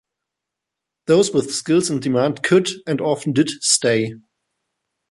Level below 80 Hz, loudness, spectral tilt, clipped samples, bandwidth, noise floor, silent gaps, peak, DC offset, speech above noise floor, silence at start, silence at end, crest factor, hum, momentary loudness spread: -64 dBFS; -18 LUFS; -4 dB/octave; under 0.1%; 11.5 kHz; -83 dBFS; none; -2 dBFS; under 0.1%; 65 dB; 1.1 s; 0.9 s; 18 dB; none; 6 LU